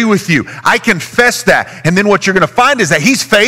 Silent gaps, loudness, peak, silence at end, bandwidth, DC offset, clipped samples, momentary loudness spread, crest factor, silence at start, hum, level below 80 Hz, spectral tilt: none; -10 LUFS; 0 dBFS; 0 s; 19 kHz; 0.6%; under 0.1%; 3 LU; 10 dB; 0 s; none; -44 dBFS; -4 dB/octave